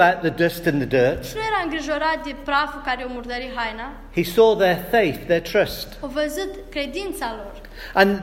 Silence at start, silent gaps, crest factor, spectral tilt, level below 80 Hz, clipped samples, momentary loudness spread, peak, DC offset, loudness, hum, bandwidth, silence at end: 0 s; none; 20 dB; -5 dB/octave; -42 dBFS; under 0.1%; 11 LU; 0 dBFS; under 0.1%; -22 LUFS; none; 16.5 kHz; 0 s